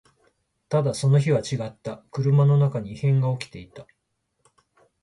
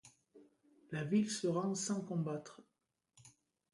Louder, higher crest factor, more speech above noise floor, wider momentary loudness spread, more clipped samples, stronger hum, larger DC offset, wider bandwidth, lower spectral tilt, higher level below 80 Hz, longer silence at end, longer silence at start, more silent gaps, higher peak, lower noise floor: first, -23 LUFS vs -38 LUFS; about the same, 16 dB vs 18 dB; first, 53 dB vs 49 dB; about the same, 14 LU vs 12 LU; neither; neither; neither; about the same, 11.5 kHz vs 11.5 kHz; first, -7.5 dB/octave vs -5 dB/octave; first, -60 dBFS vs -82 dBFS; first, 1.2 s vs 0.45 s; first, 0.7 s vs 0.05 s; neither; first, -8 dBFS vs -24 dBFS; second, -75 dBFS vs -86 dBFS